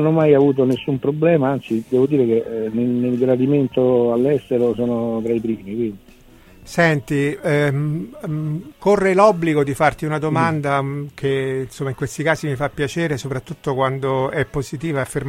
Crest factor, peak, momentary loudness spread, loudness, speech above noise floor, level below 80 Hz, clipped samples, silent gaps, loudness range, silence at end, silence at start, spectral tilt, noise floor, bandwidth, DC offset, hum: 18 dB; 0 dBFS; 10 LU; -19 LUFS; 28 dB; -48 dBFS; under 0.1%; none; 4 LU; 0 s; 0 s; -7 dB/octave; -46 dBFS; 16 kHz; under 0.1%; none